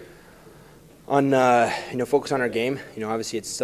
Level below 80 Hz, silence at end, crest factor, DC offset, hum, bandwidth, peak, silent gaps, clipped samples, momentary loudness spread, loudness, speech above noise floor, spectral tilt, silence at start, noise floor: -60 dBFS; 0 s; 20 dB; under 0.1%; none; 15 kHz; -4 dBFS; none; under 0.1%; 11 LU; -23 LUFS; 27 dB; -4.5 dB/octave; 0 s; -49 dBFS